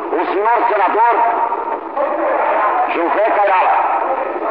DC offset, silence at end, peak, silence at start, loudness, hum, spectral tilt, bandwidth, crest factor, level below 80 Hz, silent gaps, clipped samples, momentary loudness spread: 0.3%; 0 s; -6 dBFS; 0 s; -15 LUFS; none; -7 dB/octave; 5.2 kHz; 10 dB; -60 dBFS; none; under 0.1%; 6 LU